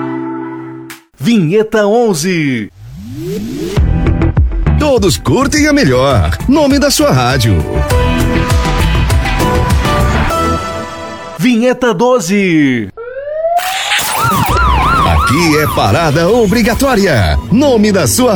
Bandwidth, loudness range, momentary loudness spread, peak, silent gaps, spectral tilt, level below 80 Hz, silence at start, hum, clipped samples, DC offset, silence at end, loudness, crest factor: over 20 kHz; 4 LU; 12 LU; 0 dBFS; none; -5 dB/octave; -20 dBFS; 0 s; none; under 0.1%; under 0.1%; 0 s; -11 LUFS; 10 dB